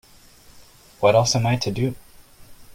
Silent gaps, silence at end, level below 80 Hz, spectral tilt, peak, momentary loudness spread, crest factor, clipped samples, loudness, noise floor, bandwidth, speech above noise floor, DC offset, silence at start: none; 0.05 s; -50 dBFS; -5 dB/octave; -4 dBFS; 10 LU; 20 dB; under 0.1%; -20 LUFS; -50 dBFS; 16 kHz; 30 dB; under 0.1%; 0.55 s